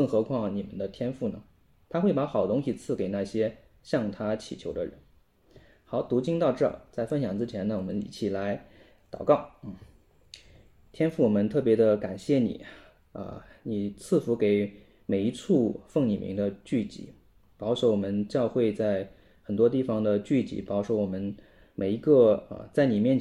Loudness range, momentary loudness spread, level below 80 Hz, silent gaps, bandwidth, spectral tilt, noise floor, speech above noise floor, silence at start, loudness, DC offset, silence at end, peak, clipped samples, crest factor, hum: 4 LU; 14 LU; -60 dBFS; none; 11.5 kHz; -7.5 dB/octave; -62 dBFS; 35 dB; 0 s; -28 LUFS; under 0.1%; 0 s; -8 dBFS; under 0.1%; 20 dB; none